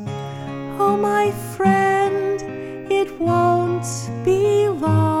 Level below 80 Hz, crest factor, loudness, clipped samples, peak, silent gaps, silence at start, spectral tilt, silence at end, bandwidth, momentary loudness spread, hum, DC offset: -50 dBFS; 14 dB; -19 LUFS; under 0.1%; -4 dBFS; none; 0 s; -6.5 dB/octave; 0 s; 17 kHz; 13 LU; none; under 0.1%